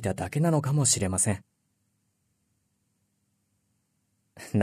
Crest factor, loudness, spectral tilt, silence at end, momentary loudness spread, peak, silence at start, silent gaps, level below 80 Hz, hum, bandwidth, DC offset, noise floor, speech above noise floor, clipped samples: 20 dB; -26 LUFS; -4.5 dB/octave; 0 s; 8 LU; -10 dBFS; 0 s; none; -60 dBFS; none; 13.5 kHz; under 0.1%; -75 dBFS; 49 dB; under 0.1%